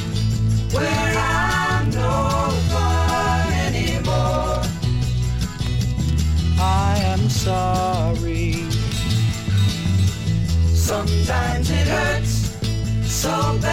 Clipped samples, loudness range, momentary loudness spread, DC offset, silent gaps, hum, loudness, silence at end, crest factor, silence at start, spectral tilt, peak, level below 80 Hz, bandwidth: under 0.1%; 1 LU; 4 LU; under 0.1%; none; none; -20 LUFS; 0 s; 12 dB; 0 s; -5 dB/octave; -8 dBFS; -28 dBFS; 16.5 kHz